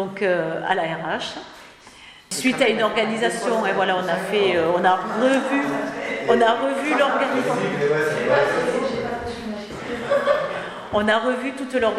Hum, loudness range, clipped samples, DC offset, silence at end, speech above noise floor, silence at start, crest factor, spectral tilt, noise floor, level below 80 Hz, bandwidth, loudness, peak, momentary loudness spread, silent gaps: none; 3 LU; under 0.1%; under 0.1%; 0 s; 25 dB; 0 s; 18 dB; -4.5 dB/octave; -45 dBFS; -56 dBFS; 14.5 kHz; -21 LUFS; -4 dBFS; 10 LU; none